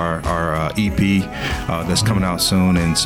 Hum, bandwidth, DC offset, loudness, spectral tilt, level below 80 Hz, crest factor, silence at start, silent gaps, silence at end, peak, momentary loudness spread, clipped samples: none; 19 kHz; under 0.1%; -18 LUFS; -4.5 dB/octave; -32 dBFS; 12 dB; 0 s; none; 0 s; -6 dBFS; 6 LU; under 0.1%